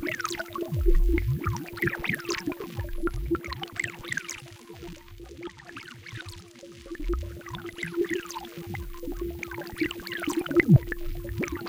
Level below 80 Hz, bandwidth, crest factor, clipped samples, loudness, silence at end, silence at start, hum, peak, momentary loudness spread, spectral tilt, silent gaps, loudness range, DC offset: -34 dBFS; 17 kHz; 24 dB; under 0.1%; -30 LUFS; 0 s; 0 s; none; -6 dBFS; 17 LU; -5.5 dB/octave; none; 11 LU; under 0.1%